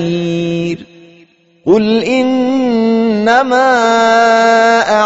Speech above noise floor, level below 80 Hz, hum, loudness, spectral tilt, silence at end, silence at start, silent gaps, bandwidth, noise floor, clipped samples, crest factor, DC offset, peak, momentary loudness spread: 37 dB; -52 dBFS; none; -11 LUFS; -3.5 dB/octave; 0 s; 0 s; none; 8 kHz; -47 dBFS; under 0.1%; 12 dB; under 0.1%; 0 dBFS; 8 LU